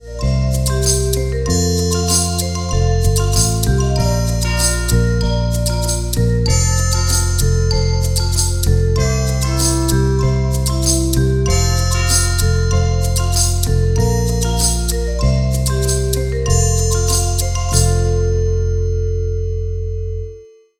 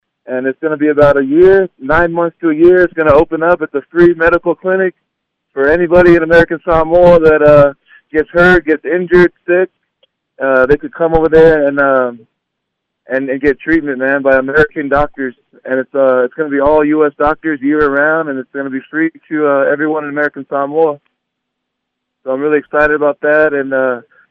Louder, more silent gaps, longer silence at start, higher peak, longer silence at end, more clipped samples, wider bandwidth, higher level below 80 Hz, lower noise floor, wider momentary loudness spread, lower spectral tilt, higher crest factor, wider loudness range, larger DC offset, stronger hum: second, -16 LUFS vs -11 LUFS; neither; second, 0.05 s vs 0.3 s; about the same, 0 dBFS vs 0 dBFS; about the same, 0.35 s vs 0.3 s; second, under 0.1% vs 0.1%; first, 19 kHz vs 6.2 kHz; first, -20 dBFS vs -34 dBFS; second, -38 dBFS vs -74 dBFS; second, 4 LU vs 11 LU; second, -4.5 dB/octave vs -8.5 dB/octave; about the same, 14 dB vs 12 dB; second, 1 LU vs 6 LU; neither; neither